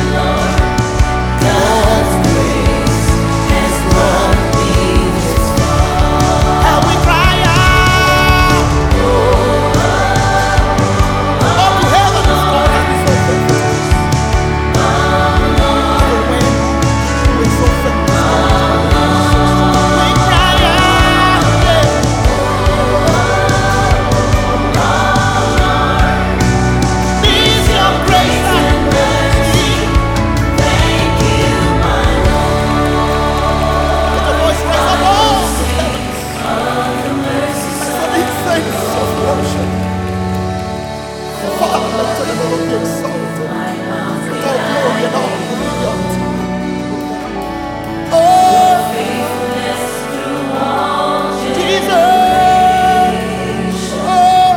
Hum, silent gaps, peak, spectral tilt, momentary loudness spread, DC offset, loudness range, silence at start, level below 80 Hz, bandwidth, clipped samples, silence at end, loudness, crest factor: none; none; 0 dBFS; -5 dB/octave; 8 LU; under 0.1%; 7 LU; 0 s; -20 dBFS; 18 kHz; under 0.1%; 0 s; -12 LUFS; 12 dB